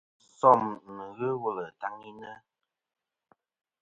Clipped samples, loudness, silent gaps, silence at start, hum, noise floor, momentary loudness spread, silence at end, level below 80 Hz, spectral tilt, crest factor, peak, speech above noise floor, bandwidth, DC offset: under 0.1%; -28 LUFS; none; 0.45 s; none; -70 dBFS; 23 LU; 1.45 s; -74 dBFS; -7.5 dB/octave; 26 dB; -4 dBFS; 42 dB; 8 kHz; under 0.1%